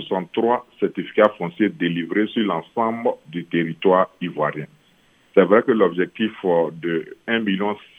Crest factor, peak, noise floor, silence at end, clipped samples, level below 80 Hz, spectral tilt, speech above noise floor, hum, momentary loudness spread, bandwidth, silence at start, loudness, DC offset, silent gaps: 20 dB; 0 dBFS; -57 dBFS; 0.2 s; under 0.1%; -72 dBFS; -8 dB/octave; 37 dB; none; 8 LU; 3.9 kHz; 0 s; -21 LUFS; under 0.1%; none